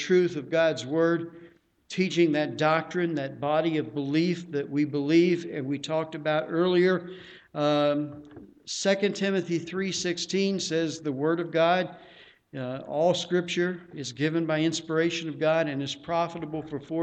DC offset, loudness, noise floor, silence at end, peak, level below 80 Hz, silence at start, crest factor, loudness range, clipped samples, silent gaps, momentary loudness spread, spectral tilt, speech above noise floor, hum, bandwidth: under 0.1%; -27 LUFS; -52 dBFS; 0 s; -10 dBFS; -70 dBFS; 0 s; 16 dB; 2 LU; under 0.1%; none; 12 LU; -5 dB/octave; 26 dB; none; 8.8 kHz